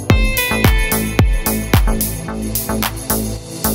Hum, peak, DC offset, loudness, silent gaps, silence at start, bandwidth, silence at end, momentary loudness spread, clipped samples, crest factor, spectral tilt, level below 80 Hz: none; 0 dBFS; under 0.1%; -17 LUFS; none; 0 s; 17 kHz; 0 s; 6 LU; under 0.1%; 16 dB; -4.5 dB/octave; -20 dBFS